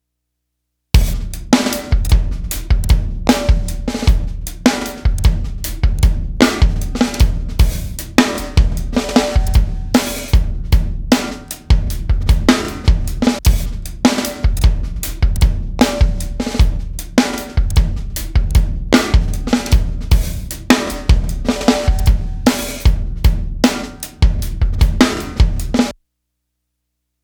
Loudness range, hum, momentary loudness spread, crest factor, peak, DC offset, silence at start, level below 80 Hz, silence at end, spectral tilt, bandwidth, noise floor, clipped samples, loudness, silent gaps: 1 LU; none; 6 LU; 14 dB; 0 dBFS; under 0.1%; 0.95 s; -16 dBFS; 1.3 s; -5.5 dB/octave; over 20 kHz; -74 dBFS; under 0.1%; -17 LUFS; none